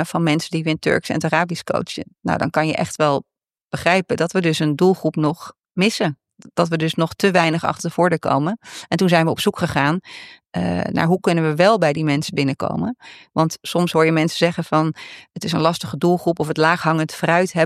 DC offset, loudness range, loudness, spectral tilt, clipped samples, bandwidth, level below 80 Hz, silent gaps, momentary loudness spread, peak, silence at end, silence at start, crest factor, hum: under 0.1%; 2 LU; -19 LUFS; -5.5 dB/octave; under 0.1%; 14.5 kHz; -54 dBFS; 3.64-3.70 s; 10 LU; -2 dBFS; 0 s; 0 s; 18 dB; none